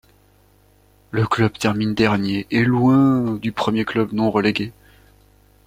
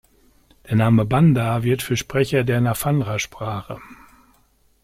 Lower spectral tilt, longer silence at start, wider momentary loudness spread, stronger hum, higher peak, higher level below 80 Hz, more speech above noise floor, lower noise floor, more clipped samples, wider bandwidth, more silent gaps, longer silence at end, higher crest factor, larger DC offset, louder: about the same, -7 dB/octave vs -6.5 dB/octave; first, 1.15 s vs 0.65 s; second, 8 LU vs 13 LU; first, 50 Hz at -40 dBFS vs none; first, -2 dBFS vs -6 dBFS; about the same, -50 dBFS vs -46 dBFS; second, 36 dB vs 40 dB; second, -55 dBFS vs -59 dBFS; neither; about the same, 15.5 kHz vs 16 kHz; neither; about the same, 0.95 s vs 0.9 s; about the same, 18 dB vs 14 dB; neither; about the same, -19 LUFS vs -20 LUFS